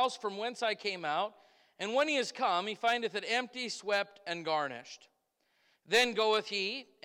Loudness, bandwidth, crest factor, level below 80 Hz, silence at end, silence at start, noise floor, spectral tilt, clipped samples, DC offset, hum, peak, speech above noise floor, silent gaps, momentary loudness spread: -33 LUFS; 17 kHz; 16 dB; -80 dBFS; 0.2 s; 0 s; -77 dBFS; -2 dB/octave; under 0.1%; under 0.1%; none; -18 dBFS; 43 dB; none; 11 LU